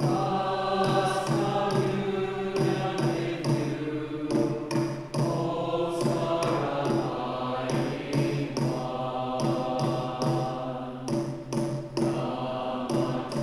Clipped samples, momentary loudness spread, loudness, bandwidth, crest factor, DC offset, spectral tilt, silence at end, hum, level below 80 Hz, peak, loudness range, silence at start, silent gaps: under 0.1%; 5 LU; -28 LUFS; 13 kHz; 16 dB; under 0.1%; -6.5 dB/octave; 0 s; none; -56 dBFS; -12 dBFS; 3 LU; 0 s; none